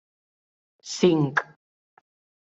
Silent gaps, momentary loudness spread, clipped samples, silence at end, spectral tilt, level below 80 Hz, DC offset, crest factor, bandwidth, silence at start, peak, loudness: none; 23 LU; under 0.1%; 1.05 s; -5.5 dB/octave; -70 dBFS; under 0.1%; 22 dB; 8 kHz; 0.85 s; -6 dBFS; -23 LUFS